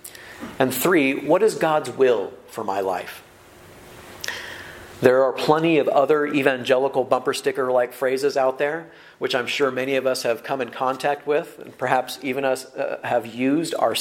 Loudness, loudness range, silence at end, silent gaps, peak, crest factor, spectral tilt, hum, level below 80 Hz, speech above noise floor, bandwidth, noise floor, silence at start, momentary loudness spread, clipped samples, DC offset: -22 LUFS; 5 LU; 0 s; none; 0 dBFS; 22 dB; -4.5 dB/octave; none; -64 dBFS; 26 dB; 16.5 kHz; -47 dBFS; 0.05 s; 14 LU; under 0.1%; under 0.1%